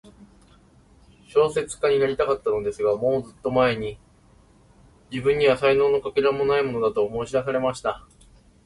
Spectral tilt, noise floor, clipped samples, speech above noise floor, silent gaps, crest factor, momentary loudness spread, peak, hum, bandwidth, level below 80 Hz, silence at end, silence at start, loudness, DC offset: -5.5 dB/octave; -55 dBFS; under 0.1%; 33 dB; none; 16 dB; 8 LU; -6 dBFS; none; 11.5 kHz; -52 dBFS; 0.65 s; 1.35 s; -23 LUFS; under 0.1%